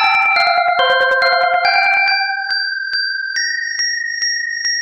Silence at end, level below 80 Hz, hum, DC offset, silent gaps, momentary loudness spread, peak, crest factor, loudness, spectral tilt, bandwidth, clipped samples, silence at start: 0 s; -62 dBFS; none; under 0.1%; none; 6 LU; -2 dBFS; 14 dB; -14 LUFS; 2 dB/octave; 10.5 kHz; under 0.1%; 0 s